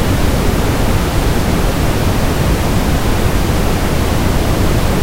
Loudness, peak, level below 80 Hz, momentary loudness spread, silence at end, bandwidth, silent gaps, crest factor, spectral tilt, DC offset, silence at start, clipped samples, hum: -15 LUFS; 0 dBFS; -18 dBFS; 1 LU; 0 s; 16 kHz; none; 12 dB; -5.5 dB/octave; under 0.1%; 0 s; under 0.1%; none